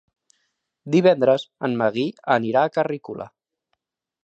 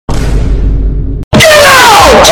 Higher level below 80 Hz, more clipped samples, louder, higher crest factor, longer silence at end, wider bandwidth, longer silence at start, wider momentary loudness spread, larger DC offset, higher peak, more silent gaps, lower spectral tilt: second, -70 dBFS vs -12 dBFS; second, under 0.1% vs 6%; second, -21 LUFS vs -4 LUFS; first, 18 dB vs 4 dB; first, 0.95 s vs 0 s; second, 8 kHz vs over 20 kHz; first, 0.85 s vs 0.1 s; first, 16 LU vs 12 LU; neither; second, -4 dBFS vs 0 dBFS; second, none vs 1.24-1.31 s; first, -7 dB/octave vs -3 dB/octave